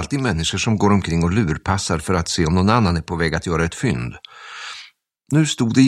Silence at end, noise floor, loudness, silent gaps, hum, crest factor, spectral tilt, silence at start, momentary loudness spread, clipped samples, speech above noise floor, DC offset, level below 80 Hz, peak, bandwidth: 0 s; -47 dBFS; -19 LUFS; none; none; 18 dB; -5.5 dB/octave; 0 s; 15 LU; under 0.1%; 29 dB; under 0.1%; -36 dBFS; 0 dBFS; 12.5 kHz